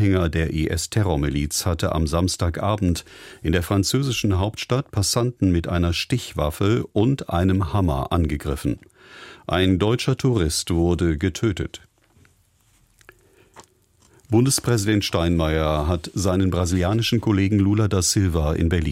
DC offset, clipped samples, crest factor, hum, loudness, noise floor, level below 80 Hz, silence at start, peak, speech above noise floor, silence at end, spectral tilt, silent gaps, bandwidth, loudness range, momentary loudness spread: under 0.1%; under 0.1%; 16 dB; none; -21 LUFS; -60 dBFS; -34 dBFS; 0 s; -6 dBFS; 39 dB; 0 s; -5.5 dB/octave; none; 16.5 kHz; 5 LU; 6 LU